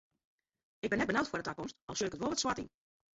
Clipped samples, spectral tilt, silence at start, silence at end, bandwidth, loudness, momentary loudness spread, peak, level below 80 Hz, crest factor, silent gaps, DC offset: under 0.1%; -3 dB/octave; 0.85 s; 0.45 s; 8 kHz; -36 LUFS; 10 LU; -18 dBFS; -64 dBFS; 20 dB; 1.82-1.88 s; under 0.1%